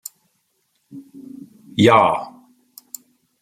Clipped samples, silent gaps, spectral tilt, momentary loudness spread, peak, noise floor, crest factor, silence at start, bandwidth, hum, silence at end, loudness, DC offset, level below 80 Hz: under 0.1%; none; -5.5 dB/octave; 27 LU; -2 dBFS; -68 dBFS; 20 dB; 0.95 s; 16.5 kHz; none; 1.1 s; -16 LUFS; under 0.1%; -62 dBFS